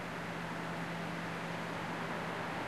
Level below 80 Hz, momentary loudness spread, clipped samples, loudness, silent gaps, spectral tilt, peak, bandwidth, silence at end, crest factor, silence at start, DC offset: -66 dBFS; 2 LU; under 0.1%; -40 LUFS; none; -5 dB/octave; -28 dBFS; 13 kHz; 0 s; 12 dB; 0 s; 0.1%